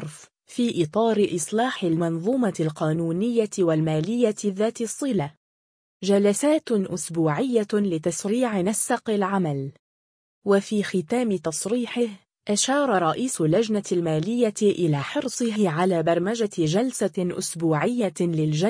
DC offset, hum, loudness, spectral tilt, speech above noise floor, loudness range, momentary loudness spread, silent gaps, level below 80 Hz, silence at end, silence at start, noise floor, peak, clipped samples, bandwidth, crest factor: under 0.1%; none; -24 LUFS; -5.5 dB/octave; 21 dB; 2 LU; 5 LU; 5.37-6.00 s, 9.79-10.42 s; -66 dBFS; 0 s; 0 s; -44 dBFS; -8 dBFS; under 0.1%; 10.5 kHz; 16 dB